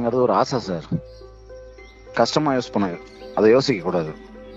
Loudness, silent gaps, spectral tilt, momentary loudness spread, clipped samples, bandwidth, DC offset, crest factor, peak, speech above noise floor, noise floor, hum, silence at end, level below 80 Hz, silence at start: -21 LUFS; none; -6 dB/octave; 21 LU; under 0.1%; 8 kHz; under 0.1%; 18 dB; -4 dBFS; 22 dB; -42 dBFS; none; 0 s; -48 dBFS; 0 s